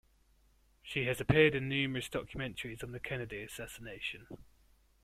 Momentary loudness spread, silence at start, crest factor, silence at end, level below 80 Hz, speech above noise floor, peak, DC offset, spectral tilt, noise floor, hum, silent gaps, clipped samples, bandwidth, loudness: 19 LU; 0.85 s; 24 dB; 0.6 s; -58 dBFS; 33 dB; -12 dBFS; under 0.1%; -5.5 dB/octave; -68 dBFS; none; none; under 0.1%; 16 kHz; -35 LUFS